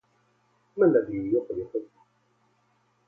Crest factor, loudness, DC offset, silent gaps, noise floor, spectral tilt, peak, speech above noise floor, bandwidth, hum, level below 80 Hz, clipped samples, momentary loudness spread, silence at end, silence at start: 20 dB; -26 LUFS; under 0.1%; none; -68 dBFS; -11.5 dB/octave; -10 dBFS; 43 dB; 2.6 kHz; 60 Hz at -60 dBFS; -64 dBFS; under 0.1%; 14 LU; 1.25 s; 0.75 s